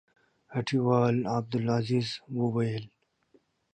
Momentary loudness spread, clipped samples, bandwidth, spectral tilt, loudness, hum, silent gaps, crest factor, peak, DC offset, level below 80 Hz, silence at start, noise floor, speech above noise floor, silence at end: 9 LU; under 0.1%; 9.2 kHz; -7.5 dB/octave; -29 LUFS; none; none; 18 dB; -12 dBFS; under 0.1%; -66 dBFS; 0.5 s; -67 dBFS; 39 dB; 0.85 s